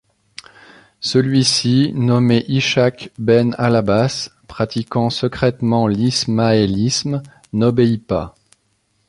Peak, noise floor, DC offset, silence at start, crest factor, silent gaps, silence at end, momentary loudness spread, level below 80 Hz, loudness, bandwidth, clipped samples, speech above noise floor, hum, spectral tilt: -2 dBFS; -64 dBFS; under 0.1%; 1 s; 16 dB; none; 0.8 s; 10 LU; -46 dBFS; -17 LUFS; 11.5 kHz; under 0.1%; 48 dB; none; -5.5 dB/octave